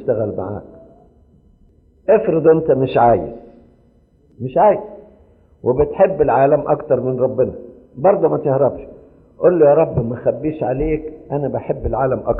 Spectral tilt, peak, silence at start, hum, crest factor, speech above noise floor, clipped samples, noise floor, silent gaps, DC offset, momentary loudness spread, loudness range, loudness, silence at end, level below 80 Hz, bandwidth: -12 dB/octave; -2 dBFS; 0 s; none; 16 dB; 37 dB; under 0.1%; -53 dBFS; none; under 0.1%; 13 LU; 2 LU; -16 LUFS; 0 s; -40 dBFS; 4.1 kHz